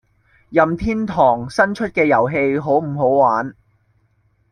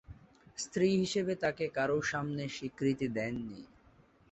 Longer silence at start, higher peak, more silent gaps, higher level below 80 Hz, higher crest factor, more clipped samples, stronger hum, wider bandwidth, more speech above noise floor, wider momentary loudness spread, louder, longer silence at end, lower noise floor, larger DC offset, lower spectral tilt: first, 0.5 s vs 0.1 s; first, -2 dBFS vs -18 dBFS; neither; first, -44 dBFS vs -64 dBFS; about the same, 16 dB vs 18 dB; neither; neither; first, 10.5 kHz vs 8.4 kHz; first, 44 dB vs 30 dB; second, 6 LU vs 12 LU; first, -17 LUFS vs -34 LUFS; first, 1 s vs 0.65 s; about the same, -61 dBFS vs -64 dBFS; neither; first, -7.5 dB/octave vs -5 dB/octave